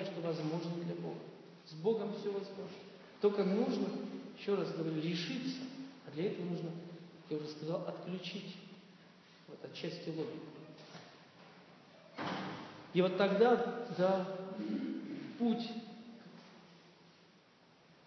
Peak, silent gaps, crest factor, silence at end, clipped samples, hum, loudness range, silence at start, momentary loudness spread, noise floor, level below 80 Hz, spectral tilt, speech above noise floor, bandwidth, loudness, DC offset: -16 dBFS; none; 22 dB; 0.95 s; under 0.1%; none; 11 LU; 0 s; 21 LU; -65 dBFS; -88 dBFS; -5.5 dB/octave; 29 dB; 6.4 kHz; -38 LUFS; under 0.1%